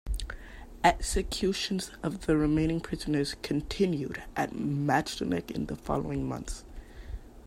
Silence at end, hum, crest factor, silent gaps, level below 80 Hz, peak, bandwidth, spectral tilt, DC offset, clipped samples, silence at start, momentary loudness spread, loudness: 0 s; none; 22 dB; none; -42 dBFS; -8 dBFS; 16 kHz; -5 dB/octave; under 0.1%; under 0.1%; 0.05 s; 17 LU; -30 LUFS